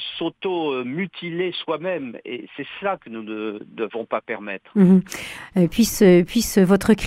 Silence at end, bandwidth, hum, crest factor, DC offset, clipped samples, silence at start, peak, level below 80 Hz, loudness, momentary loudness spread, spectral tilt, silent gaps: 0 s; 16 kHz; none; 18 dB; under 0.1%; under 0.1%; 0 s; -2 dBFS; -48 dBFS; -21 LUFS; 16 LU; -6 dB/octave; none